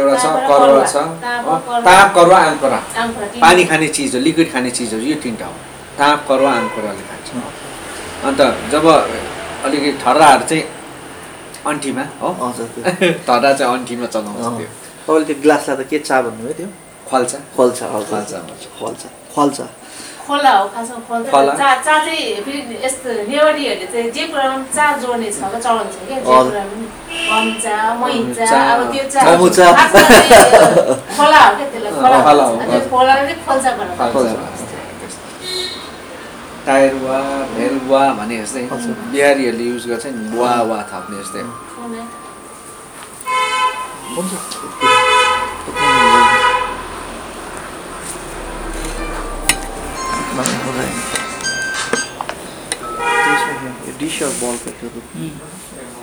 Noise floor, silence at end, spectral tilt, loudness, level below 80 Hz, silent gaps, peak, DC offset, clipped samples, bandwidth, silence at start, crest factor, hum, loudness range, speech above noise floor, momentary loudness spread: -34 dBFS; 0 s; -3 dB/octave; -13 LUFS; -42 dBFS; none; 0 dBFS; under 0.1%; 0.6%; over 20 kHz; 0 s; 14 dB; none; 11 LU; 21 dB; 19 LU